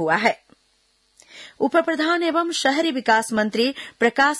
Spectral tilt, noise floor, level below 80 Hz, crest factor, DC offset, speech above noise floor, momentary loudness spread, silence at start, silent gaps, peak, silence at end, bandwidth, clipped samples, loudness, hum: -3 dB/octave; -64 dBFS; -66 dBFS; 16 dB; under 0.1%; 44 dB; 7 LU; 0 s; none; -4 dBFS; 0 s; 12 kHz; under 0.1%; -20 LUFS; none